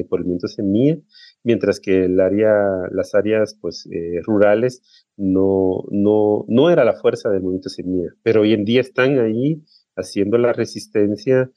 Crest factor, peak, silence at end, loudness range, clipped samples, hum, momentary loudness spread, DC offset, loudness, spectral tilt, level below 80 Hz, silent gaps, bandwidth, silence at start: 16 dB; -2 dBFS; 0.1 s; 2 LU; under 0.1%; none; 10 LU; under 0.1%; -18 LUFS; -7 dB/octave; -58 dBFS; none; 12 kHz; 0 s